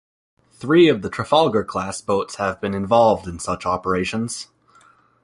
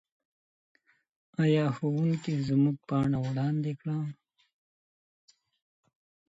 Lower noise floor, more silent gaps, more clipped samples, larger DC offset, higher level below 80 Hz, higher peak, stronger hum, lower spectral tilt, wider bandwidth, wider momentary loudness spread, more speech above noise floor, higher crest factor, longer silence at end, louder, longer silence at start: second, -54 dBFS vs under -90 dBFS; neither; neither; neither; first, -48 dBFS vs -64 dBFS; first, -2 dBFS vs -16 dBFS; neither; second, -5 dB/octave vs -8.5 dB/octave; first, 11.5 kHz vs 8 kHz; first, 12 LU vs 8 LU; second, 35 dB vs over 62 dB; about the same, 18 dB vs 16 dB; second, 0.8 s vs 2.15 s; first, -20 LUFS vs -29 LUFS; second, 0.6 s vs 1.4 s